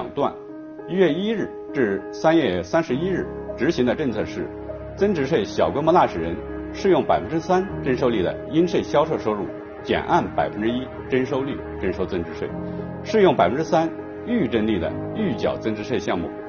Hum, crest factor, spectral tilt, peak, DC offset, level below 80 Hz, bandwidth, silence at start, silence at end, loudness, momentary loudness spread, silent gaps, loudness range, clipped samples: none; 18 dB; -5 dB/octave; -4 dBFS; under 0.1%; -46 dBFS; 6.8 kHz; 0 s; 0 s; -22 LUFS; 11 LU; none; 2 LU; under 0.1%